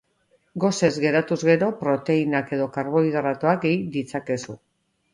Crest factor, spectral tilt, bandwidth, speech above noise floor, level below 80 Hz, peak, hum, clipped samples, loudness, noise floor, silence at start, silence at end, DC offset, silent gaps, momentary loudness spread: 18 dB; -6 dB/octave; 11 kHz; 43 dB; -64 dBFS; -4 dBFS; none; under 0.1%; -23 LUFS; -65 dBFS; 0.55 s; 0.55 s; under 0.1%; none; 9 LU